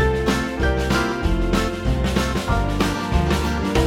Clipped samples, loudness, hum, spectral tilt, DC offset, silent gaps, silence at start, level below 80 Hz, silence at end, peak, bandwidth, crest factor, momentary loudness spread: under 0.1%; -21 LUFS; none; -5.5 dB/octave; under 0.1%; none; 0 s; -24 dBFS; 0 s; -6 dBFS; 16.5 kHz; 14 dB; 2 LU